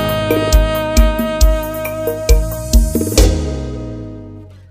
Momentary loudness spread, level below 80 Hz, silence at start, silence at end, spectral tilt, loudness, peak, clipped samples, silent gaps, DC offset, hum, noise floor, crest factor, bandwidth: 14 LU; -16 dBFS; 0 s; 0.1 s; -5 dB/octave; -16 LUFS; 0 dBFS; under 0.1%; none; under 0.1%; none; -34 dBFS; 14 dB; 16 kHz